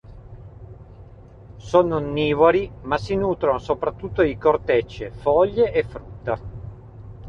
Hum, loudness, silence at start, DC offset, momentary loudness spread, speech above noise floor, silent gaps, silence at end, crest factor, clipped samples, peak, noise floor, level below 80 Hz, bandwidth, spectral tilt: none; -21 LUFS; 0.05 s; under 0.1%; 21 LU; 23 dB; none; 0 s; 20 dB; under 0.1%; -4 dBFS; -43 dBFS; -42 dBFS; 7.4 kHz; -7.5 dB/octave